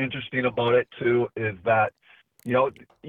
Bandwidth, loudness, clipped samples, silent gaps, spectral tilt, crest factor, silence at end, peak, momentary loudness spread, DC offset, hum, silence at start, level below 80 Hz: 4.3 kHz; -24 LUFS; under 0.1%; none; -8 dB/octave; 16 dB; 0 s; -8 dBFS; 6 LU; under 0.1%; none; 0 s; -62 dBFS